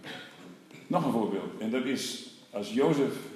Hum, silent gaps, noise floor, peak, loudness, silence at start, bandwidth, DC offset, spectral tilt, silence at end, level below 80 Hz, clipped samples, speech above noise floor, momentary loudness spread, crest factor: none; none; -50 dBFS; -14 dBFS; -31 LUFS; 0 s; 14.5 kHz; under 0.1%; -5.5 dB/octave; 0 s; -84 dBFS; under 0.1%; 20 dB; 21 LU; 18 dB